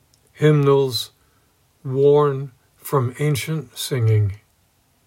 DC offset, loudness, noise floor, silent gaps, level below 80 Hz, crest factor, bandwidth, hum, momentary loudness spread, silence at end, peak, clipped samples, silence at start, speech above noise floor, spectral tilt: under 0.1%; -19 LUFS; -61 dBFS; none; -62 dBFS; 16 dB; 16.5 kHz; none; 18 LU; 0.7 s; -4 dBFS; under 0.1%; 0.4 s; 43 dB; -6.5 dB/octave